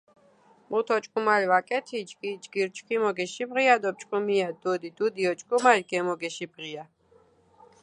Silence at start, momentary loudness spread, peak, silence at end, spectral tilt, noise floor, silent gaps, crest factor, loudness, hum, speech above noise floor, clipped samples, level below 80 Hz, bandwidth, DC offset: 0.7 s; 14 LU; -4 dBFS; 1 s; -4 dB/octave; -61 dBFS; none; 22 dB; -26 LUFS; none; 35 dB; under 0.1%; -80 dBFS; 11 kHz; under 0.1%